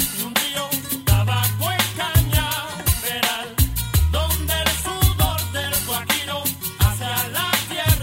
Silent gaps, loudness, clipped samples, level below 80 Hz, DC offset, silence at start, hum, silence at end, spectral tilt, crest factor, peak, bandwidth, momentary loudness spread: none; -20 LUFS; under 0.1%; -28 dBFS; under 0.1%; 0 s; none; 0 s; -3.5 dB/octave; 18 dB; -4 dBFS; 16.5 kHz; 4 LU